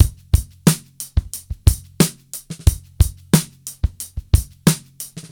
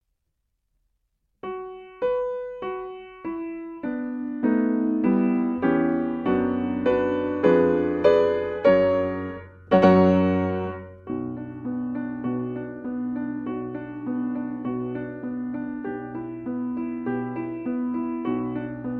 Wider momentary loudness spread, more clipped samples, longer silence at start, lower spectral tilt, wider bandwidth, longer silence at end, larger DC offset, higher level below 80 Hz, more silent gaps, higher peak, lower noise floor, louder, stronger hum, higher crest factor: about the same, 15 LU vs 14 LU; neither; second, 0 s vs 1.45 s; second, -5 dB/octave vs -9.5 dB/octave; first, over 20 kHz vs 6.6 kHz; about the same, 0.1 s vs 0 s; neither; first, -24 dBFS vs -56 dBFS; neither; first, 0 dBFS vs -4 dBFS; second, -36 dBFS vs -76 dBFS; first, -20 LUFS vs -25 LUFS; neither; about the same, 18 dB vs 20 dB